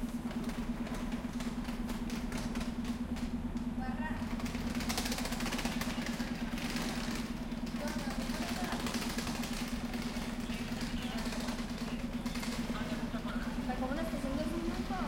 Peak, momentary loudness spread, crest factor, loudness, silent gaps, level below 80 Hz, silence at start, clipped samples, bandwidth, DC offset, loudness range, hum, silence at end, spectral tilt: -20 dBFS; 3 LU; 16 dB; -38 LUFS; none; -44 dBFS; 0 s; under 0.1%; 16.5 kHz; under 0.1%; 2 LU; none; 0 s; -4.5 dB/octave